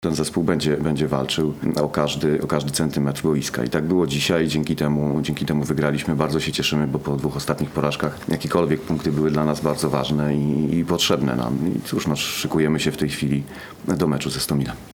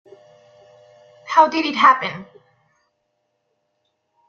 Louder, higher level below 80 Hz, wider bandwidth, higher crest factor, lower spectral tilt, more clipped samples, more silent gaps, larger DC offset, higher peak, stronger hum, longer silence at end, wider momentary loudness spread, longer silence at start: second, -22 LUFS vs -16 LUFS; first, -44 dBFS vs -72 dBFS; first, 19.5 kHz vs 7.4 kHz; about the same, 18 dB vs 20 dB; first, -5.5 dB/octave vs -4 dB/octave; neither; neither; neither; about the same, -2 dBFS vs -2 dBFS; neither; second, 0 s vs 2.05 s; second, 4 LU vs 13 LU; second, 0 s vs 1.25 s